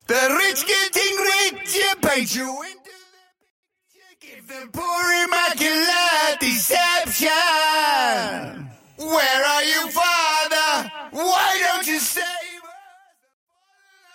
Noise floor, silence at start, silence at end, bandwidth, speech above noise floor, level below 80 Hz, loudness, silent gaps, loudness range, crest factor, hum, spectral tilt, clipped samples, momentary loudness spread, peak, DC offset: -60 dBFS; 0.1 s; 1.35 s; 16.5 kHz; 39 dB; -60 dBFS; -18 LUFS; 3.50-3.63 s; 7 LU; 16 dB; none; -0.5 dB/octave; under 0.1%; 15 LU; -6 dBFS; under 0.1%